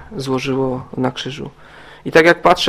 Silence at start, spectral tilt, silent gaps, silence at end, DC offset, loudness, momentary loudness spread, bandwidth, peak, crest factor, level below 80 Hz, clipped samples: 0 s; -5 dB/octave; none; 0 s; 0.3%; -16 LUFS; 19 LU; 15.5 kHz; 0 dBFS; 18 dB; -46 dBFS; 0.1%